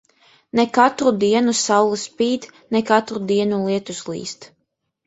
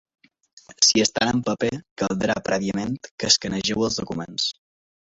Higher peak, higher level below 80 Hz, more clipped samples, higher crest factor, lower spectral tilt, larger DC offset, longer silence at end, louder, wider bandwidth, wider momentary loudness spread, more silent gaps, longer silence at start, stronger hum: about the same, 0 dBFS vs 0 dBFS; second, -62 dBFS vs -54 dBFS; neither; about the same, 20 dB vs 24 dB; about the same, -4 dB/octave vs -3 dB/octave; neither; about the same, 0.6 s vs 0.6 s; first, -19 LUFS vs -22 LUFS; about the same, 8.2 kHz vs 8.2 kHz; about the same, 13 LU vs 11 LU; second, none vs 1.91-1.96 s, 3.11-3.18 s; second, 0.55 s vs 0.7 s; neither